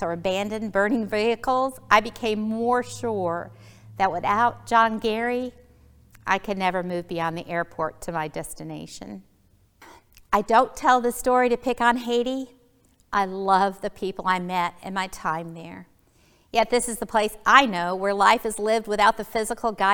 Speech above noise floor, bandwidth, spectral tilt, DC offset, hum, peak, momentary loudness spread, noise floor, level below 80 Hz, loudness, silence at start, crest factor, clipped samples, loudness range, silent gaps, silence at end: 37 dB; over 20 kHz; -4 dB/octave; under 0.1%; none; 0 dBFS; 13 LU; -60 dBFS; -52 dBFS; -23 LUFS; 0 s; 24 dB; under 0.1%; 7 LU; none; 0 s